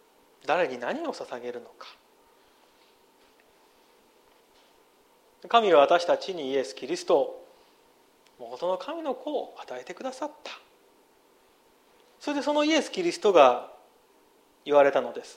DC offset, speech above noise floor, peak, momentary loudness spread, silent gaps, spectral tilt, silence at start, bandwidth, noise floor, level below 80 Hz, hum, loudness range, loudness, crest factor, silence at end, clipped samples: under 0.1%; 36 dB; -4 dBFS; 23 LU; none; -3.5 dB/octave; 0.45 s; 13 kHz; -62 dBFS; -80 dBFS; none; 13 LU; -26 LUFS; 24 dB; 0.05 s; under 0.1%